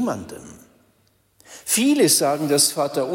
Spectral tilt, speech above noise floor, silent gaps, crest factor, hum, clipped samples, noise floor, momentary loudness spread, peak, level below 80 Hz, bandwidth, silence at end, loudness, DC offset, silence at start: -3 dB/octave; 42 dB; none; 18 dB; none; under 0.1%; -62 dBFS; 20 LU; -4 dBFS; -64 dBFS; 16.5 kHz; 0 s; -18 LUFS; under 0.1%; 0 s